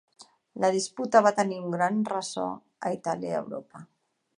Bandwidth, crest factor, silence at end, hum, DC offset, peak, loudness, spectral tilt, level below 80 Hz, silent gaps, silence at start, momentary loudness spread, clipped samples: 11 kHz; 22 dB; 0.55 s; none; under 0.1%; -6 dBFS; -27 LUFS; -4.5 dB/octave; -78 dBFS; none; 0.2 s; 13 LU; under 0.1%